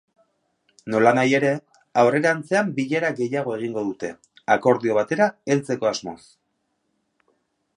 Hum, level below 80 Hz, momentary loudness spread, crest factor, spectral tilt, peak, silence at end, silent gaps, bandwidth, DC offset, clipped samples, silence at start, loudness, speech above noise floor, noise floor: none; -68 dBFS; 13 LU; 20 dB; -5.5 dB/octave; -4 dBFS; 1.6 s; none; 11 kHz; under 0.1%; under 0.1%; 0.85 s; -21 LUFS; 52 dB; -73 dBFS